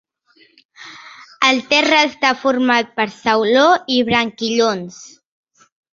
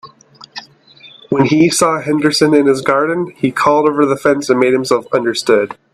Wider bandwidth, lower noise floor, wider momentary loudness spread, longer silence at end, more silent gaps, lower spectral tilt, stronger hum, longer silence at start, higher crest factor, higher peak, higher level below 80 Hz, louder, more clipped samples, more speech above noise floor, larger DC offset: second, 7.6 kHz vs 14 kHz; first, -55 dBFS vs -42 dBFS; first, 14 LU vs 7 LU; first, 0.85 s vs 0.2 s; neither; second, -3 dB/octave vs -4.5 dB/octave; neither; first, 0.8 s vs 0.05 s; about the same, 16 dB vs 14 dB; about the same, -2 dBFS vs 0 dBFS; about the same, -58 dBFS vs -56 dBFS; about the same, -15 LUFS vs -13 LUFS; neither; first, 38 dB vs 30 dB; neither